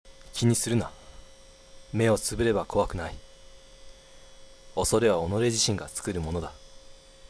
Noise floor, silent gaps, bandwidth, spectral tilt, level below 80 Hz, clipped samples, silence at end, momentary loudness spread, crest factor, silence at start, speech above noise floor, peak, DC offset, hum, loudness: -51 dBFS; none; 11 kHz; -4.5 dB/octave; -46 dBFS; under 0.1%; 0.35 s; 13 LU; 20 dB; 0.05 s; 25 dB; -10 dBFS; under 0.1%; none; -27 LUFS